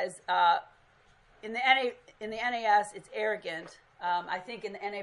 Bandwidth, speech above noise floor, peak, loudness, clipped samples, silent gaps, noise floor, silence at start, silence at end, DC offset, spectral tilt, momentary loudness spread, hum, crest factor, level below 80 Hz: 11.5 kHz; 32 dB; -8 dBFS; -30 LUFS; under 0.1%; none; -63 dBFS; 0 s; 0 s; under 0.1%; -2.5 dB/octave; 15 LU; none; 24 dB; -74 dBFS